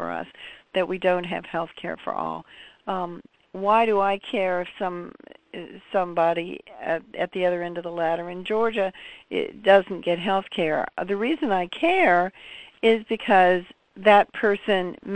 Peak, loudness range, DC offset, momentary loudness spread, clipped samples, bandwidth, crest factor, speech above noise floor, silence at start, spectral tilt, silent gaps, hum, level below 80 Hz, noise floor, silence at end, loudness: -2 dBFS; 7 LU; 0.1%; 18 LU; under 0.1%; 9.2 kHz; 22 dB; 21 dB; 0 s; -6.5 dB/octave; none; none; -62 dBFS; -45 dBFS; 0 s; -24 LUFS